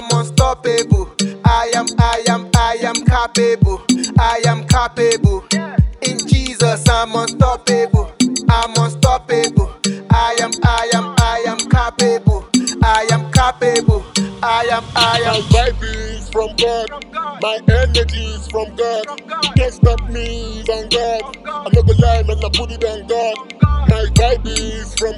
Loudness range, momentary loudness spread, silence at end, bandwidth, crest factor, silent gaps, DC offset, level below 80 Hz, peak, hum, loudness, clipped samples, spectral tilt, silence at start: 3 LU; 8 LU; 0 s; 15 kHz; 14 dB; none; under 0.1%; -22 dBFS; 0 dBFS; none; -15 LUFS; under 0.1%; -5 dB/octave; 0 s